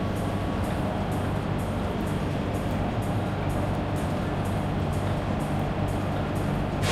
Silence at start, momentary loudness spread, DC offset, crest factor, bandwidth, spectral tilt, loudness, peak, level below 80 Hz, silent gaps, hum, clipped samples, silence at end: 0 s; 1 LU; under 0.1%; 14 dB; 14.5 kHz; -7 dB/octave; -28 LUFS; -14 dBFS; -38 dBFS; none; none; under 0.1%; 0 s